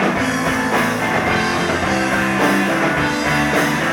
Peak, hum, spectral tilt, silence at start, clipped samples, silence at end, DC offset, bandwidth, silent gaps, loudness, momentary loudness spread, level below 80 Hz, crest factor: -4 dBFS; none; -4.5 dB/octave; 0 s; under 0.1%; 0 s; under 0.1%; 19 kHz; none; -17 LUFS; 2 LU; -40 dBFS; 14 dB